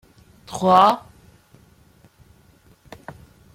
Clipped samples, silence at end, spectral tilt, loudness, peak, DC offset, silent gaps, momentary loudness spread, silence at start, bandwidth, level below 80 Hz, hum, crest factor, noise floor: under 0.1%; 2.55 s; -5.5 dB/octave; -17 LUFS; -2 dBFS; under 0.1%; none; 27 LU; 0.5 s; 16.5 kHz; -58 dBFS; none; 22 dB; -54 dBFS